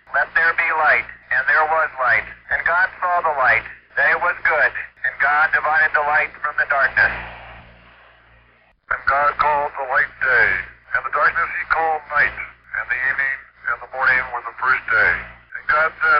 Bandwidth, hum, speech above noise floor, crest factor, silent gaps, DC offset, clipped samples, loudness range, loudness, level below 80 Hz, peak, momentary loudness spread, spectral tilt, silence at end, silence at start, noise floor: 5.6 kHz; none; 37 dB; 14 dB; none; under 0.1%; under 0.1%; 3 LU; -18 LUFS; -48 dBFS; -6 dBFS; 9 LU; 0 dB/octave; 0 s; 0.1 s; -55 dBFS